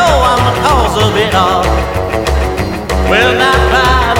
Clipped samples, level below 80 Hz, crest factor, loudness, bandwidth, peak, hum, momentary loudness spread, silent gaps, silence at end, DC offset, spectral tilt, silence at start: under 0.1%; -18 dBFS; 10 dB; -11 LUFS; 17 kHz; 0 dBFS; none; 6 LU; none; 0 s; under 0.1%; -4.5 dB/octave; 0 s